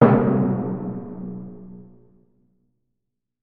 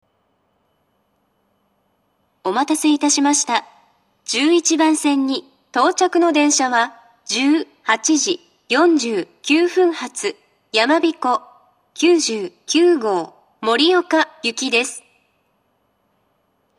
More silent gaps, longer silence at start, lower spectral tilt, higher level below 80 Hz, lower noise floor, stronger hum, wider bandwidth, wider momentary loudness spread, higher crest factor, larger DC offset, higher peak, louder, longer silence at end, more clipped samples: neither; second, 0 s vs 2.45 s; first, -9.5 dB/octave vs -1.5 dB/octave; first, -54 dBFS vs -80 dBFS; first, -82 dBFS vs -65 dBFS; neither; second, 4.2 kHz vs 13 kHz; first, 24 LU vs 10 LU; about the same, 22 dB vs 20 dB; neither; about the same, 0 dBFS vs 0 dBFS; second, -23 LUFS vs -17 LUFS; second, 1.6 s vs 1.8 s; neither